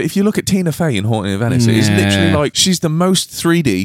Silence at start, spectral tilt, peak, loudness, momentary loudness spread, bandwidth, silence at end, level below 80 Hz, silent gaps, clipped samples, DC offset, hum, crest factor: 0 s; -5 dB/octave; 0 dBFS; -14 LUFS; 4 LU; 16.5 kHz; 0 s; -44 dBFS; none; under 0.1%; under 0.1%; none; 14 dB